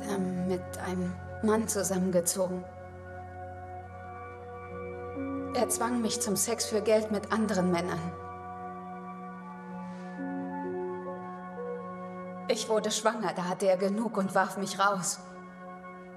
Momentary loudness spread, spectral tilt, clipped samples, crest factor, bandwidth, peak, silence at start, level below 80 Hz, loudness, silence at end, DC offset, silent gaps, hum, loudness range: 16 LU; -4.5 dB/octave; under 0.1%; 22 dB; 13.5 kHz; -10 dBFS; 0 s; -66 dBFS; -31 LUFS; 0 s; under 0.1%; none; none; 9 LU